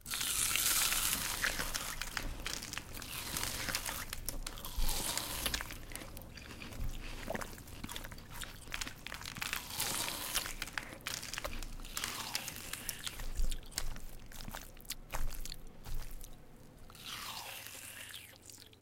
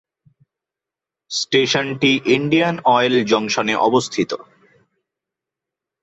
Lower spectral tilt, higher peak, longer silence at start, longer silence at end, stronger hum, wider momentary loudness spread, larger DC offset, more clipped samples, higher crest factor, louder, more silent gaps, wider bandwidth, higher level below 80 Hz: second, -1 dB/octave vs -4 dB/octave; second, -10 dBFS vs -2 dBFS; second, 0 s vs 1.3 s; second, 0 s vs 1.6 s; neither; first, 16 LU vs 8 LU; neither; neither; first, 30 dB vs 18 dB; second, -38 LUFS vs -17 LUFS; neither; first, 17 kHz vs 8.2 kHz; first, -44 dBFS vs -62 dBFS